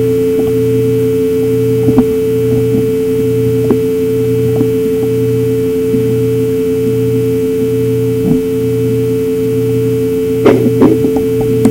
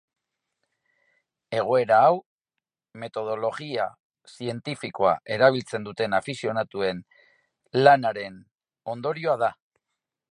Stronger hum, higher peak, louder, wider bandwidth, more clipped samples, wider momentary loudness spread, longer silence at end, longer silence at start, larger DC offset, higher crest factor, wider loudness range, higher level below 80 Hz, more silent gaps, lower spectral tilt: neither; about the same, 0 dBFS vs -2 dBFS; first, -12 LUFS vs -24 LUFS; first, 16 kHz vs 11 kHz; first, 0.2% vs under 0.1%; second, 4 LU vs 17 LU; second, 0 s vs 0.8 s; second, 0 s vs 1.5 s; first, 0.3% vs under 0.1%; second, 12 dB vs 24 dB; about the same, 1 LU vs 3 LU; first, -40 dBFS vs -68 dBFS; second, none vs 2.26-2.39 s, 4.00-4.10 s, 8.51-8.55 s; first, -8 dB/octave vs -5.5 dB/octave